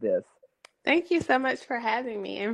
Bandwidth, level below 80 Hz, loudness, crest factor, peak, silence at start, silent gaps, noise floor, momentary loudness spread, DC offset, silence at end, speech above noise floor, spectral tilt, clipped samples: 10.5 kHz; -68 dBFS; -27 LUFS; 20 dB; -8 dBFS; 0 s; none; -58 dBFS; 8 LU; under 0.1%; 0 s; 31 dB; -5 dB/octave; under 0.1%